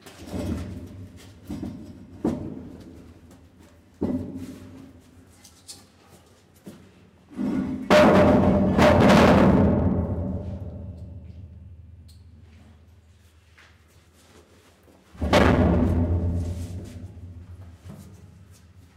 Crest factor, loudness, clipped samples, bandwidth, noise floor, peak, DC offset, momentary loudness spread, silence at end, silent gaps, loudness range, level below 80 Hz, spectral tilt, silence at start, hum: 20 dB; -21 LUFS; under 0.1%; 15.5 kHz; -55 dBFS; -4 dBFS; under 0.1%; 28 LU; 0.8 s; none; 19 LU; -40 dBFS; -7 dB/octave; 0.05 s; none